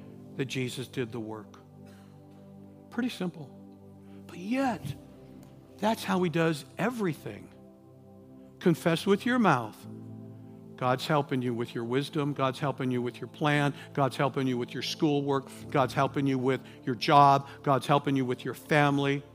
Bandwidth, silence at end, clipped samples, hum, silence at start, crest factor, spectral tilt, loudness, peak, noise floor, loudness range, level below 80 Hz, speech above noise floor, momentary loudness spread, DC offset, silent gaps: 15.5 kHz; 0.05 s; under 0.1%; none; 0 s; 22 dB; -6 dB/octave; -29 LUFS; -6 dBFS; -53 dBFS; 10 LU; -68 dBFS; 24 dB; 19 LU; under 0.1%; none